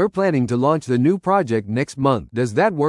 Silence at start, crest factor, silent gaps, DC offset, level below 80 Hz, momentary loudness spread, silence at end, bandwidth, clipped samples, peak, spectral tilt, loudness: 0 s; 16 dB; none; under 0.1%; -54 dBFS; 4 LU; 0 s; 11.5 kHz; under 0.1%; -2 dBFS; -7.5 dB/octave; -19 LUFS